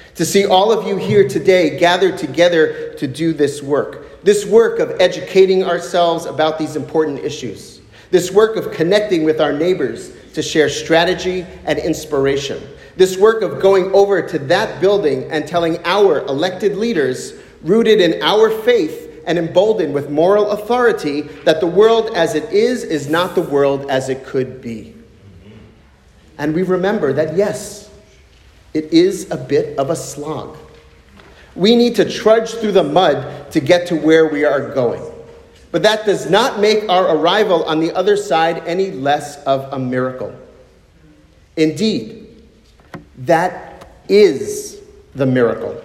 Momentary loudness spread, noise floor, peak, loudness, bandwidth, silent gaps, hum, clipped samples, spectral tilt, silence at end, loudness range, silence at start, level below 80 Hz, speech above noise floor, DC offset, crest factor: 12 LU; -47 dBFS; 0 dBFS; -15 LUFS; 15.5 kHz; none; none; under 0.1%; -5 dB/octave; 0 s; 6 LU; 0.15 s; -50 dBFS; 32 dB; under 0.1%; 16 dB